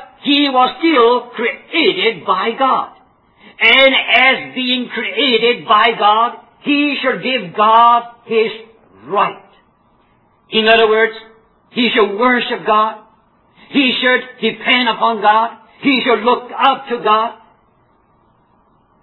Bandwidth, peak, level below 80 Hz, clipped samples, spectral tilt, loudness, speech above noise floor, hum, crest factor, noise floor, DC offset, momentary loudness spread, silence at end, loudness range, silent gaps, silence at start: 5.4 kHz; 0 dBFS; -60 dBFS; under 0.1%; -6 dB/octave; -13 LUFS; 41 dB; none; 14 dB; -55 dBFS; under 0.1%; 10 LU; 1.7 s; 4 LU; none; 0 s